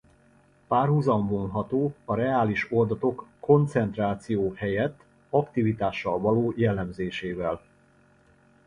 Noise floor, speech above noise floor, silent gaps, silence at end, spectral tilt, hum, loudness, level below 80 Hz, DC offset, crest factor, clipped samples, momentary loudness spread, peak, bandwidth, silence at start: -60 dBFS; 35 dB; none; 1.1 s; -8.5 dB/octave; none; -26 LUFS; -54 dBFS; under 0.1%; 20 dB; under 0.1%; 8 LU; -6 dBFS; 10.5 kHz; 0.7 s